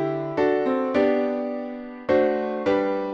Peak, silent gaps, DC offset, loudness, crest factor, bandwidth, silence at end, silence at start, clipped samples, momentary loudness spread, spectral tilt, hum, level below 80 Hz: -8 dBFS; none; under 0.1%; -23 LUFS; 14 dB; 7 kHz; 0 s; 0 s; under 0.1%; 9 LU; -7.5 dB/octave; none; -58 dBFS